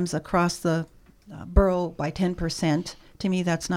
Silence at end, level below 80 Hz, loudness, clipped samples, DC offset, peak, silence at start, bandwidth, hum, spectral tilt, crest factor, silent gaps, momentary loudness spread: 0 s; -32 dBFS; -25 LUFS; under 0.1%; under 0.1%; -4 dBFS; 0 s; 15 kHz; none; -6 dB/octave; 22 dB; none; 15 LU